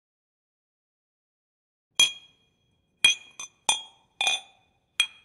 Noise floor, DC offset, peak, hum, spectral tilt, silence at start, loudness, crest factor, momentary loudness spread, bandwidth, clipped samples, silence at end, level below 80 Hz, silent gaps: -71 dBFS; under 0.1%; -4 dBFS; none; 2.5 dB/octave; 2 s; -24 LUFS; 28 dB; 11 LU; 16 kHz; under 0.1%; 0.15 s; -74 dBFS; none